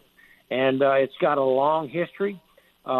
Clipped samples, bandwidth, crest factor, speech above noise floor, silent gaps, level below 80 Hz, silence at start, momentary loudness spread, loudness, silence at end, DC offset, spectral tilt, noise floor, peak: under 0.1%; 12.5 kHz; 16 dB; 34 dB; none; -70 dBFS; 0.5 s; 10 LU; -23 LUFS; 0 s; under 0.1%; -8 dB/octave; -56 dBFS; -8 dBFS